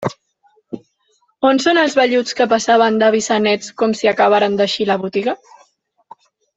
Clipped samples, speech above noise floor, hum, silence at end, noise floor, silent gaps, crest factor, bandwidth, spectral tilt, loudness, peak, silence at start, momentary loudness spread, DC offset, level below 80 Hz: under 0.1%; 47 dB; none; 1.2 s; -62 dBFS; none; 14 dB; 8.2 kHz; -4 dB/octave; -15 LUFS; -2 dBFS; 0 s; 14 LU; under 0.1%; -62 dBFS